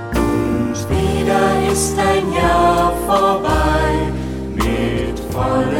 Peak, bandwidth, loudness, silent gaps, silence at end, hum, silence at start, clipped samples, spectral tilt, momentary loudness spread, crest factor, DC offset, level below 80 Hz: -2 dBFS; 17 kHz; -17 LUFS; none; 0 s; none; 0 s; under 0.1%; -5.5 dB/octave; 7 LU; 14 dB; under 0.1%; -26 dBFS